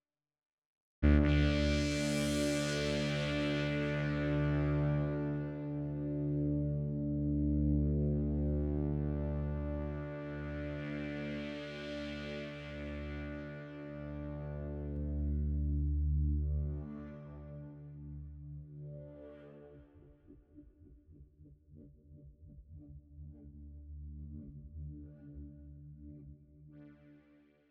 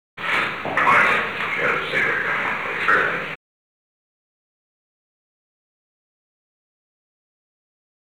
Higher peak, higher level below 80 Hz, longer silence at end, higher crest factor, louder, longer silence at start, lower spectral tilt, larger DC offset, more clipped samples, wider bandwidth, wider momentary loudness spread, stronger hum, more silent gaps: second, -14 dBFS vs -6 dBFS; first, -42 dBFS vs -60 dBFS; second, 0.55 s vs 4.8 s; about the same, 22 dB vs 20 dB; second, -36 LUFS vs -19 LUFS; first, 1 s vs 0.15 s; first, -6.5 dB/octave vs -4 dB/octave; second, under 0.1% vs 0.4%; neither; second, 12.5 kHz vs over 20 kHz; first, 21 LU vs 8 LU; neither; neither